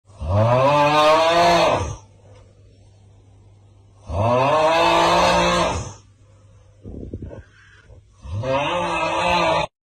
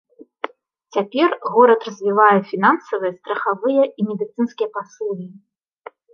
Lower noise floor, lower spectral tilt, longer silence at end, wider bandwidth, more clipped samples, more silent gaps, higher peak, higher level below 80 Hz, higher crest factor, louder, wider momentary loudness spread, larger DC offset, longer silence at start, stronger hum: first, -50 dBFS vs -43 dBFS; second, -4.5 dB/octave vs -6.5 dB/octave; second, 0.3 s vs 0.8 s; first, 15.5 kHz vs 6.8 kHz; neither; neither; second, -8 dBFS vs -2 dBFS; first, -40 dBFS vs -74 dBFS; second, 12 dB vs 18 dB; about the same, -18 LUFS vs -18 LUFS; first, 20 LU vs 17 LU; neither; second, 0.2 s vs 0.45 s; neither